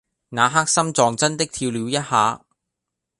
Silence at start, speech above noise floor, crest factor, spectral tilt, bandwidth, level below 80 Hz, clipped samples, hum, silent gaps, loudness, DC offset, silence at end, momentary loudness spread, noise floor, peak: 0.3 s; 63 dB; 20 dB; -3 dB/octave; 11.5 kHz; -58 dBFS; under 0.1%; none; none; -19 LUFS; under 0.1%; 0.8 s; 7 LU; -82 dBFS; -2 dBFS